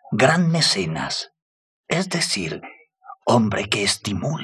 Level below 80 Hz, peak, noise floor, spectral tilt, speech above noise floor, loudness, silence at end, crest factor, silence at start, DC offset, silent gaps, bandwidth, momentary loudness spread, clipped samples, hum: -50 dBFS; -4 dBFS; -45 dBFS; -4 dB/octave; 25 dB; -21 LUFS; 0 s; 18 dB; 0.05 s; under 0.1%; 1.42-1.84 s; 13.5 kHz; 11 LU; under 0.1%; none